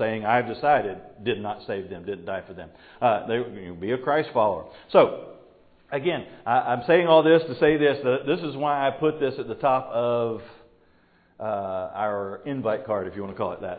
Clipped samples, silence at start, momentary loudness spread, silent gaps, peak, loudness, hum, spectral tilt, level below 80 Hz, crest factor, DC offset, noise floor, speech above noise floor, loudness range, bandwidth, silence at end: under 0.1%; 0 s; 14 LU; none; -4 dBFS; -24 LUFS; none; -10.5 dB/octave; -60 dBFS; 22 dB; under 0.1%; -60 dBFS; 36 dB; 8 LU; 4.8 kHz; 0 s